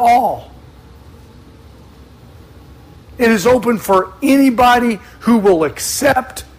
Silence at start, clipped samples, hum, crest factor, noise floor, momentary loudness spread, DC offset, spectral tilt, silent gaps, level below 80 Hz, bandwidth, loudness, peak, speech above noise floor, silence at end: 0 s; under 0.1%; none; 14 dB; -40 dBFS; 8 LU; under 0.1%; -4.5 dB/octave; none; -42 dBFS; 16 kHz; -13 LUFS; -2 dBFS; 27 dB; 0.15 s